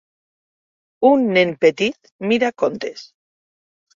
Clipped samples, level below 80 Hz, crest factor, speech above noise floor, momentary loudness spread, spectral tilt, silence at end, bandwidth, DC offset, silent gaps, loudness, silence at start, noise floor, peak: under 0.1%; -64 dBFS; 18 dB; over 72 dB; 14 LU; -5.5 dB/octave; 0.9 s; 7.6 kHz; under 0.1%; 2.12-2.19 s; -18 LUFS; 1 s; under -90 dBFS; -2 dBFS